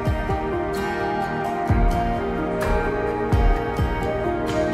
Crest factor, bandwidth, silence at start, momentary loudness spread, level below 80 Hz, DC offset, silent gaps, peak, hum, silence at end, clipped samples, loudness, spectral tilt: 14 dB; 14 kHz; 0 s; 4 LU; -26 dBFS; under 0.1%; none; -8 dBFS; none; 0 s; under 0.1%; -23 LUFS; -7 dB/octave